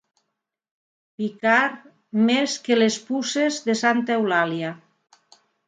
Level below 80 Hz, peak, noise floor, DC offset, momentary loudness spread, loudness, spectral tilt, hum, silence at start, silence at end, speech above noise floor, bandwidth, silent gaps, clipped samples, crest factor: -76 dBFS; -4 dBFS; -80 dBFS; under 0.1%; 10 LU; -22 LUFS; -4 dB/octave; none; 1.2 s; 0.9 s; 59 dB; 9.4 kHz; none; under 0.1%; 20 dB